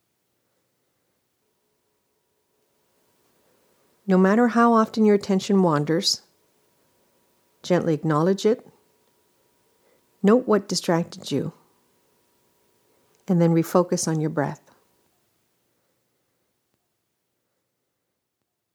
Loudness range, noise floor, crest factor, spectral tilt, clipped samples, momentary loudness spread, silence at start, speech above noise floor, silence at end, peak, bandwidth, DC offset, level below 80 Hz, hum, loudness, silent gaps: 6 LU; -80 dBFS; 22 dB; -5.5 dB/octave; under 0.1%; 10 LU; 4.05 s; 59 dB; 4.2 s; -4 dBFS; 18 kHz; under 0.1%; -74 dBFS; none; -21 LUFS; none